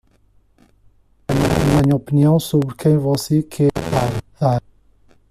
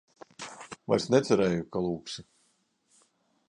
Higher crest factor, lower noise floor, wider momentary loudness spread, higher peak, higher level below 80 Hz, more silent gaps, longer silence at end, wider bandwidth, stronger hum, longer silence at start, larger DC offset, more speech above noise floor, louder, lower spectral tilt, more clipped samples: second, 16 dB vs 22 dB; second, -55 dBFS vs -72 dBFS; second, 7 LU vs 18 LU; first, -2 dBFS vs -10 dBFS; first, -38 dBFS vs -62 dBFS; neither; second, 0.7 s vs 1.25 s; first, 15 kHz vs 11 kHz; neither; first, 1.3 s vs 0.4 s; neither; second, 39 dB vs 44 dB; first, -18 LUFS vs -28 LUFS; first, -7 dB/octave vs -5.5 dB/octave; neither